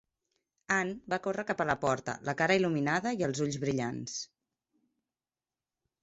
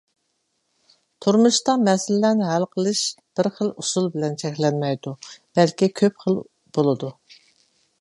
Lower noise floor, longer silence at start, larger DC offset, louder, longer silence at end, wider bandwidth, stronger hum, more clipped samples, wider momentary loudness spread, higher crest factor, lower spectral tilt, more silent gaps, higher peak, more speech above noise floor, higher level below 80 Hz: first, under -90 dBFS vs -72 dBFS; second, 0.7 s vs 1.2 s; neither; second, -32 LUFS vs -21 LUFS; first, 1.75 s vs 0.9 s; second, 8.2 kHz vs 11.5 kHz; neither; neither; about the same, 9 LU vs 9 LU; about the same, 20 dB vs 20 dB; about the same, -5 dB/octave vs -5 dB/octave; neither; second, -12 dBFS vs -4 dBFS; first, over 59 dB vs 51 dB; about the same, -68 dBFS vs -70 dBFS